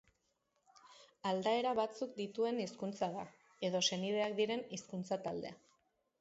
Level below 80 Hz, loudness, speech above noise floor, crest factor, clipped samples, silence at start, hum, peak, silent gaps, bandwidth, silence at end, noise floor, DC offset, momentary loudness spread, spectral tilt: -80 dBFS; -38 LUFS; 44 dB; 20 dB; under 0.1%; 0.85 s; none; -20 dBFS; none; 8 kHz; 0.65 s; -82 dBFS; under 0.1%; 10 LU; -3.5 dB/octave